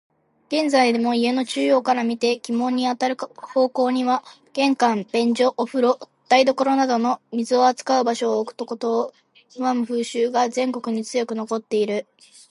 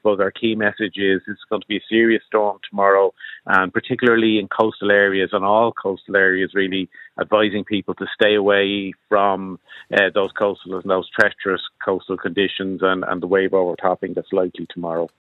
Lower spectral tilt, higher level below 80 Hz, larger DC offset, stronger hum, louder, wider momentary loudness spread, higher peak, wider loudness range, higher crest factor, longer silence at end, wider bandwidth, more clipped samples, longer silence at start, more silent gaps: second, -4 dB/octave vs -7 dB/octave; second, -78 dBFS vs -64 dBFS; neither; neither; about the same, -21 LUFS vs -19 LUFS; about the same, 8 LU vs 10 LU; second, -4 dBFS vs 0 dBFS; about the same, 4 LU vs 3 LU; about the same, 18 dB vs 18 dB; first, 0.5 s vs 0.15 s; first, 11.5 kHz vs 7.2 kHz; neither; first, 0.5 s vs 0.05 s; neither